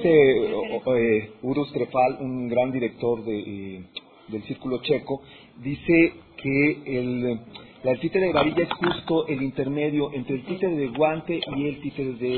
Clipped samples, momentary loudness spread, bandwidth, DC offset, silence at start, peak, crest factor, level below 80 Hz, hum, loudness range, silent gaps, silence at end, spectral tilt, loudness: under 0.1%; 13 LU; 4.5 kHz; under 0.1%; 0 s; -6 dBFS; 18 dB; -54 dBFS; none; 4 LU; none; 0 s; -10 dB/octave; -24 LUFS